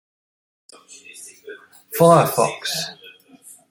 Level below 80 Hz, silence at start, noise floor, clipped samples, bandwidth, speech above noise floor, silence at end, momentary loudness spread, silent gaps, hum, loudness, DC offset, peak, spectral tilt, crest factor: -64 dBFS; 1.15 s; -47 dBFS; under 0.1%; 17 kHz; 28 dB; 0.6 s; 27 LU; none; none; -18 LUFS; under 0.1%; -2 dBFS; -4.5 dB/octave; 20 dB